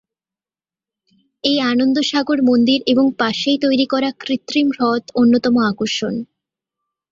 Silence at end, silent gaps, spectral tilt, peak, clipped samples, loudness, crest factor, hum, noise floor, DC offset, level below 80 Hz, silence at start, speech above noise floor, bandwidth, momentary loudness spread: 0.85 s; none; -4.5 dB/octave; -2 dBFS; under 0.1%; -16 LUFS; 16 dB; none; under -90 dBFS; under 0.1%; -60 dBFS; 1.45 s; over 74 dB; 7.6 kHz; 7 LU